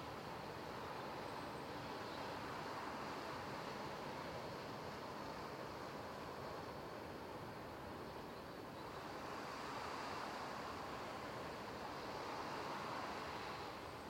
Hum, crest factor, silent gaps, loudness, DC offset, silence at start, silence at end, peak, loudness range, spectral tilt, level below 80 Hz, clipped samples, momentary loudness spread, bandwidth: none; 14 dB; none; -48 LUFS; under 0.1%; 0 s; 0 s; -34 dBFS; 3 LU; -4.5 dB/octave; -70 dBFS; under 0.1%; 4 LU; 16.5 kHz